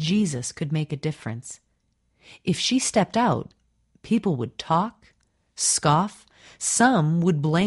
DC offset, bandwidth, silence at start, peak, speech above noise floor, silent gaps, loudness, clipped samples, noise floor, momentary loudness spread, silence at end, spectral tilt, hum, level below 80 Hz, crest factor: under 0.1%; 11.5 kHz; 0 s; -6 dBFS; 47 dB; none; -23 LUFS; under 0.1%; -70 dBFS; 14 LU; 0 s; -4.5 dB/octave; none; -60 dBFS; 18 dB